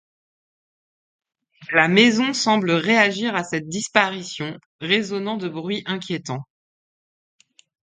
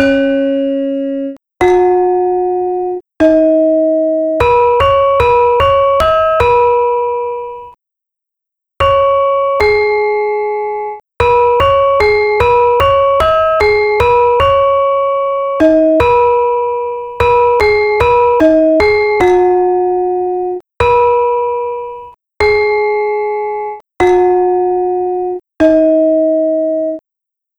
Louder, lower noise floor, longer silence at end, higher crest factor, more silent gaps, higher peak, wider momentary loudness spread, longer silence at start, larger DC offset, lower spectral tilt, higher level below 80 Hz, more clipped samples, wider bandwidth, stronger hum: second, -20 LUFS vs -11 LUFS; first, under -90 dBFS vs -81 dBFS; first, 1.45 s vs 0.6 s; first, 22 dB vs 12 dB; first, 4.66-4.79 s vs none; about the same, 0 dBFS vs 0 dBFS; first, 14 LU vs 9 LU; first, 1.6 s vs 0 s; neither; second, -4 dB/octave vs -6.5 dB/octave; second, -68 dBFS vs -34 dBFS; neither; second, 9.6 kHz vs 12 kHz; neither